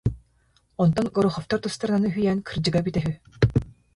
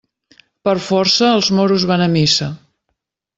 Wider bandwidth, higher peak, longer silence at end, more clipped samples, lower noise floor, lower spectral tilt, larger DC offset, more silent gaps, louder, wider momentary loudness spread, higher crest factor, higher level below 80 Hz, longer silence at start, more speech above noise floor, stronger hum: first, 11.5 kHz vs 8 kHz; about the same, -4 dBFS vs -2 dBFS; second, 0.25 s vs 0.8 s; neither; second, -64 dBFS vs -73 dBFS; first, -7 dB/octave vs -4.5 dB/octave; neither; neither; second, -24 LUFS vs -14 LUFS; about the same, 6 LU vs 7 LU; first, 20 dB vs 14 dB; first, -42 dBFS vs -52 dBFS; second, 0.05 s vs 0.65 s; second, 40 dB vs 59 dB; neither